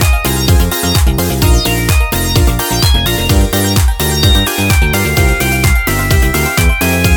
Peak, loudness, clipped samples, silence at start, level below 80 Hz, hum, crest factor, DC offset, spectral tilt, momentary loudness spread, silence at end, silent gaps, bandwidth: 0 dBFS; -11 LUFS; under 0.1%; 0 s; -14 dBFS; none; 10 dB; under 0.1%; -4 dB/octave; 2 LU; 0 s; none; over 20 kHz